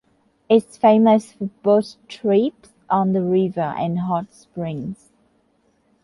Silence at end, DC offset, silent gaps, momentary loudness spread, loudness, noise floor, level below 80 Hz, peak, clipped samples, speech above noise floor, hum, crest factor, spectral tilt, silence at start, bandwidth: 1.1 s; under 0.1%; none; 16 LU; -19 LUFS; -63 dBFS; -62 dBFS; -2 dBFS; under 0.1%; 44 dB; none; 18 dB; -8 dB/octave; 0.5 s; 11.5 kHz